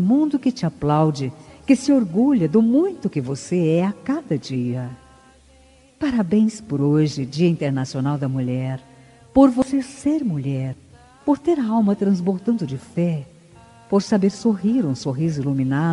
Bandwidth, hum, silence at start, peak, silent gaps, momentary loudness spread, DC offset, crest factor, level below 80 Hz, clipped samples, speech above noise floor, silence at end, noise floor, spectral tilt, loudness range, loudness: 11 kHz; none; 0 s; -2 dBFS; none; 10 LU; under 0.1%; 18 dB; -54 dBFS; under 0.1%; 32 dB; 0 s; -52 dBFS; -7.5 dB/octave; 4 LU; -21 LUFS